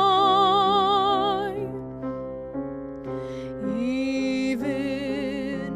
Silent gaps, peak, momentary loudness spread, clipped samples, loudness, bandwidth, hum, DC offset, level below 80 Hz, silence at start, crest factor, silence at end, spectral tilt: none; -10 dBFS; 15 LU; under 0.1%; -25 LUFS; 11.5 kHz; none; under 0.1%; -52 dBFS; 0 s; 16 dB; 0 s; -5.5 dB/octave